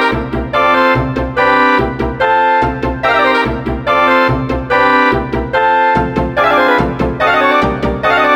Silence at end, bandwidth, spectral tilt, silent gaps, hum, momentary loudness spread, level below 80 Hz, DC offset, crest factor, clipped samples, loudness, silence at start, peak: 0 s; 19 kHz; -6.5 dB/octave; none; none; 6 LU; -28 dBFS; under 0.1%; 12 dB; under 0.1%; -12 LUFS; 0 s; 0 dBFS